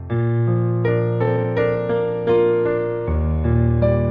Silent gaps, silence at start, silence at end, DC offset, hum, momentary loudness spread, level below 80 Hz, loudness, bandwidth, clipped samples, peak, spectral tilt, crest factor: none; 0 s; 0 s; under 0.1%; none; 4 LU; -30 dBFS; -19 LUFS; 4.2 kHz; under 0.1%; -4 dBFS; -11.5 dB/octave; 14 dB